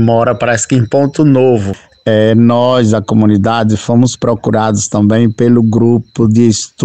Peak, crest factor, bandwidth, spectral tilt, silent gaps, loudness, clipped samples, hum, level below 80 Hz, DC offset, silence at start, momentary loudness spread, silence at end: 0 dBFS; 10 dB; 9 kHz; -6.5 dB/octave; none; -10 LUFS; 0.1%; none; -44 dBFS; 0.8%; 0 s; 4 LU; 0 s